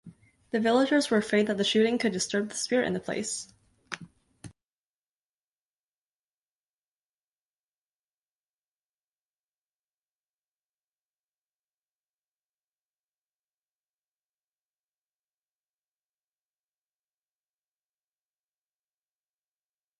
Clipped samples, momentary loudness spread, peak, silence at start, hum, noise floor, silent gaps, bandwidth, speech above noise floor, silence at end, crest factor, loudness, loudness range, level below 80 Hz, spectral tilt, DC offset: under 0.1%; 17 LU; -12 dBFS; 0.05 s; none; under -90 dBFS; none; 11.5 kHz; over 64 dB; 15.5 s; 22 dB; -27 LUFS; 23 LU; -74 dBFS; -3.5 dB/octave; under 0.1%